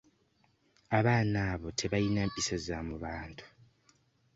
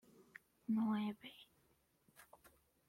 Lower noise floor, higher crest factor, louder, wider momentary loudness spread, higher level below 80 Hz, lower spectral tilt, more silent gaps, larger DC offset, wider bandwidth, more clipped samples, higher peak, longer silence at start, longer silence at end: second, -71 dBFS vs -77 dBFS; first, 20 dB vs 14 dB; first, -32 LUFS vs -42 LUFS; second, 13 LU vs 26 LU; first, -52 dBFS vs -84 dBFS; second, -5 dB/octave vs -7 dB/octave; neither; neither; second, 8 kHz vs 15.5 kHz; neither; first, -14 dBFS vs -32 dBFS; first, 0.9 s vs 0.7 s; first, 0.9 s vs 0.65 s